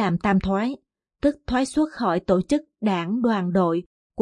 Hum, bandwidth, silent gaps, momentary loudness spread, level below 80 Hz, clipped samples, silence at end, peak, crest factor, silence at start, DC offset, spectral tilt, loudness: none; 11 kHz; 3.86-4.10 s; 5 LU; -46 dBFS; under 0.1%; 0 s; -6 dBFS; 16 dB; 0 s; under 0.1%; -7 dB/octave; -23 LUFS